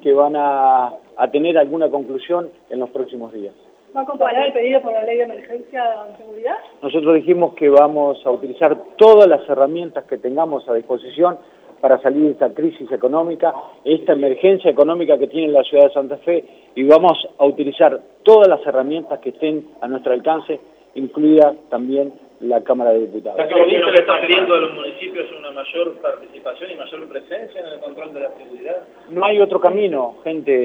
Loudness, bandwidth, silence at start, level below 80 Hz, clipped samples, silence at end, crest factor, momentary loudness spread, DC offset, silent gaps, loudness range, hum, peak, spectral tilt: -16 LUFS; 5.6 kHz; 0.05 s; -68 dBFS; under 0.1%; 0 s; 16 dB; 17 LU; under 0.1%; none; 7 LU; none; 0 dBFS; -7 dB/octave